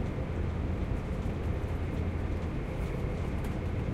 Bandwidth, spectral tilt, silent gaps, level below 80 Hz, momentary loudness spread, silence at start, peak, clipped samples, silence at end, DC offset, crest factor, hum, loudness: 13 kHz; -8 dB/octave; none; -36 dBFS; 1 LU; 0 s; -20 dBFS; under 0.1%; 0 s; under 0.1%; 12 dB; none; -34 LUFS